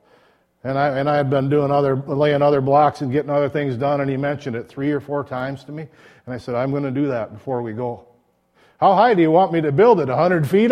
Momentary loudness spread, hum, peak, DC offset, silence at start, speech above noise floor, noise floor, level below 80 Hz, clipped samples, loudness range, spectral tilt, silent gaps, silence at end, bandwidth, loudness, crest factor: 14 LU; none; -2 dBFS; under 0.1%; 0.65 s; 41 dB; -59 dBFS; -58 dBFS; under 0.1%; 8 LU; -8.5 dB/octave; none; 0 s; 14 kHz; -19 LUFS; 16 dB